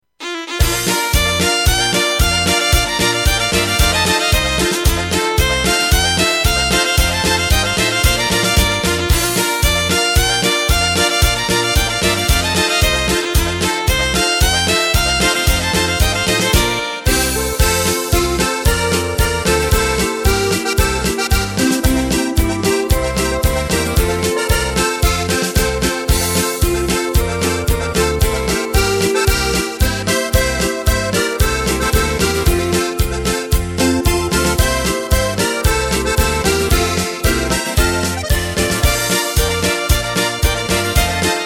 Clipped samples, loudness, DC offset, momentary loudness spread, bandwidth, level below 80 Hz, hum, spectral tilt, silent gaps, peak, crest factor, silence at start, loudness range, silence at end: under 0.1%; -15 LUFS; under 0.1%; 4 LU; 17 kHz; -22 dBFS; none; -3.5 dB/octave; none; 0 dBFS; 14 dB; 0.2 s; 2 LU; 0 s